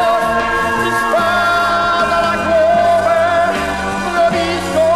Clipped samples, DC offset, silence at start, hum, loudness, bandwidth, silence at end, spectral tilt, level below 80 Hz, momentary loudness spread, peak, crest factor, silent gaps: under 0.1%; under 0.1%; 0 s; none; -14 LUFS; 14 kHz; 0 s; -4 dB/octave; -38 dBFS; 4 LU; -4 dBFS; 10 dB; none